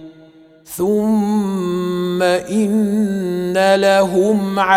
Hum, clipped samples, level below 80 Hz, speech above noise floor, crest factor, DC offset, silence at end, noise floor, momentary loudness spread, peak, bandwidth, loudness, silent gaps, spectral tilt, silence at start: none; under 0.1%; -54 dBFS; 30 dB; 14 dB; under 0.1%; 0 s; -45 dBFS; 7 LU; -2 dBFS; 16 kHz; -16 LUFS; none; -6 dB/octave; 0 s